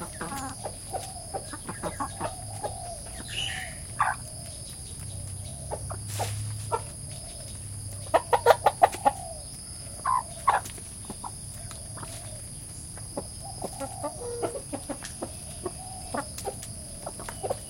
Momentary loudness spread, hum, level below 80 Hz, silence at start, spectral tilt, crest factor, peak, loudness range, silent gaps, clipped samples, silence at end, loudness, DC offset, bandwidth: 12 LU; none; -48 dBFS; 0 s; -3.5 dB/octave; 30 dB; -2 dBFS; 9 LU; none; under 0.1%; 0 s; -32 LUFS; under 0.1%; 16.5 kHz